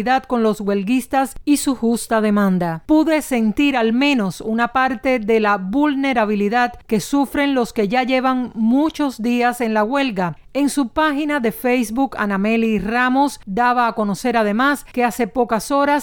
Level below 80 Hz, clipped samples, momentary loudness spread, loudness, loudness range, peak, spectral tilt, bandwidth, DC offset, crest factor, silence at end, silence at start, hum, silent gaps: -46 dBFS; under 0.1%; 4 LU; -18 LUFS; 2 LU; -6 dBFS; -5 dB/octave; 19.5 kHz; under 0.1%; 12 dB; 0 s; 0 s; none; none